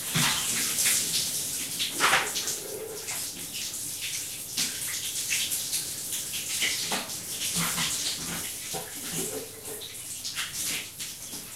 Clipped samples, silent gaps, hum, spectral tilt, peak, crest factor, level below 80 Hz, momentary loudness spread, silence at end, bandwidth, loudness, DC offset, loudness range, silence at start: under 0.1%; none; none; -0.5 dB/octave; -8 dBFS; 22 dB; -60 dBFS; 11 LU; 0 s; 16 kHz; -28 LUFS; under 0.1%; 5 LU; 0 s